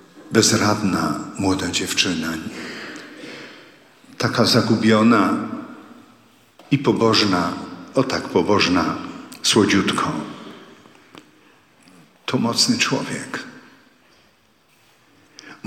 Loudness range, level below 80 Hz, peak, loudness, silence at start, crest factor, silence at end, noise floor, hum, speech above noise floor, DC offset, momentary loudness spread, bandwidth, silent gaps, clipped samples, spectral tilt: 5 LU; -58 dBFS; -2 dBFS; -19 LUFS; 0.15 s; 20 dB; 0.1 s; -58 dBFS; none; 39 dB; under 0.1%; 19 LU; 15.5 kHz; none; under 0.1%; -4 dB/octave